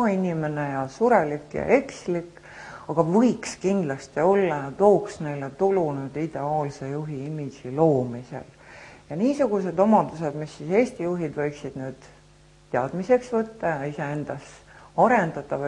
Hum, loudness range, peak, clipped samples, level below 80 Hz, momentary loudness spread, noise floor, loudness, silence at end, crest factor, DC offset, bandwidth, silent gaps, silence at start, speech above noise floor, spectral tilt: none; 5 LU; -4 dBFS; under 0.1%; -58 dBFS; 15 LU; -54 dBFS; -24 LUFS; 0 s; 20 dB; under 0.1%; 11 kHz; none; 0 s; 30 dB; -7 dB/octave